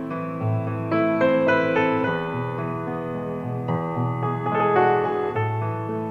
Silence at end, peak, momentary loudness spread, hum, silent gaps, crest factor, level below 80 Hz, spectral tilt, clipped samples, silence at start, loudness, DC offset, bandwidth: 0 s; -6 dBFS; 9 LU; none; none; 16 dB; -56 dBFS; -8.5 dB/octave; under 0.1%; 0 s; -23 LUFS; under 0.1%; 6.8 kHz